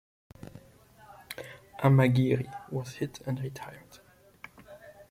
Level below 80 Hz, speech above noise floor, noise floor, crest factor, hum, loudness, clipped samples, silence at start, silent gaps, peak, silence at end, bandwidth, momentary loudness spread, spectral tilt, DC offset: -64 dBFS; 31 dB; -58 dBFS; 22 dB; none; -28 LUFS; under 0.1%; 0.45 s; none; -8 dBFS; 0.2 s; 15.5 kHz; 27 LU; -7.5 dB/octave; under 0.1%